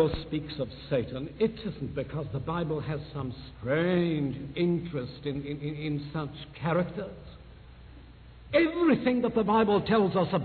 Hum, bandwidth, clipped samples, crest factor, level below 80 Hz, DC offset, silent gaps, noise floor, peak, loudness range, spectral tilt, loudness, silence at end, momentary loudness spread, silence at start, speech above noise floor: none; 4.6 kHz; under 0.1%; 18 dB; -50 dBFS; under 0.1%; none; -49 dBFS; -12 dBFS; 7 LU; -10.5 dB/octave; -29 LUFS; 0 s; 13 LU; 0 s; 21 dB